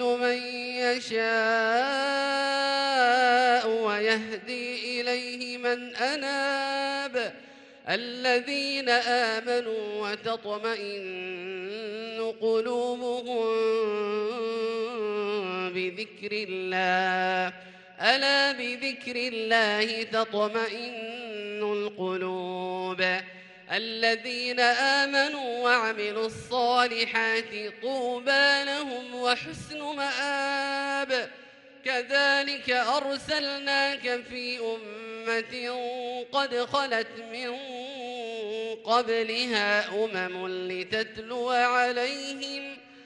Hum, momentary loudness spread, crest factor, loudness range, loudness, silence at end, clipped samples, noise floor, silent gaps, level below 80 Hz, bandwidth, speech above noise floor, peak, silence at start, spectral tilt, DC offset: none; 12 LU; 22 dB; 6 LU; -27 LUFS; 0 s; under 0.1%; -50 dBFS; none; -72 dBFS; 11.5 kHz; 22 dB; -6 dBFS; 0 s; -3 dB/octave; under 0.1%